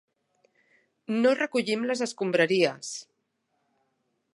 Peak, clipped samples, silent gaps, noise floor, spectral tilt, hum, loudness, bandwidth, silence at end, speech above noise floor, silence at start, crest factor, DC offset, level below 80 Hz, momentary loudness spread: -8 dBFS; under 0.1%; none; -77 dBFS; -4 dB/octave; none; -26 LUFS; 11.5 kHz; 1.35 s; 51 dB; 1.1 s; 22 dB; under 0.1%; -84 dBFS; 14 LU